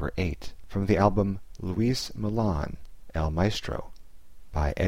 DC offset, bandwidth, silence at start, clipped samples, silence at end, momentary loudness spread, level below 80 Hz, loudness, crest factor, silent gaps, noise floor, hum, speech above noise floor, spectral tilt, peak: 0.8%; 16 kHz; 0 s; under 0.1%; 0 s; 14 LU; -38 dBFS; -29 LUFS; 20 dB; none; -49 dBFS; none; 23 dB; -6.5 dB/octave; -8 dBFS